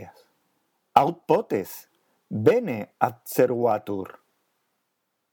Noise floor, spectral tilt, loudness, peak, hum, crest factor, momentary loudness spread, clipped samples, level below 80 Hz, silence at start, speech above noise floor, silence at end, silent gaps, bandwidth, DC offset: -77 dBFS; -6.5 dB/octave; -24 LUFS; 0 dBFS; none; 26 dB; 13 LU; under 0.1%; -76 dBFS; 0 s; 54 dB; 1.25 s; none; 19.5 kHz; under 0.1%